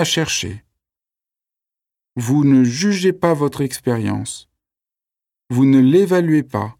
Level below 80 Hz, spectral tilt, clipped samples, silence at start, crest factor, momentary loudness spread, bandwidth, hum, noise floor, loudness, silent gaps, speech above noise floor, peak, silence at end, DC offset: -56 dBFS; -5.5 dB/octave; under 0.1%; 0 s; 16 dB; 14 LU; 15.5 kHz; none; -89 dBFS; -16 LUFS; none; 73 dB; -2 dBFS; 0.1 s; under 0.1%